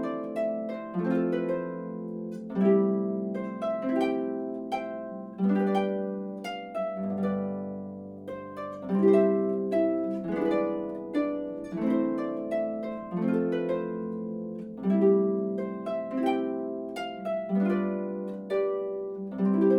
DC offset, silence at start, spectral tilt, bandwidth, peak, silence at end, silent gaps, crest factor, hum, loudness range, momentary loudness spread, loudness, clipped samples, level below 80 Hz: under 0.1%; 0 s; -9 dB/octave; 9.2 kHz; -10 dBFS; 0 s; none; 18 dB; none; 3 LU; 12 LU; -29 LUFS; under 0.1%; -68 dBFS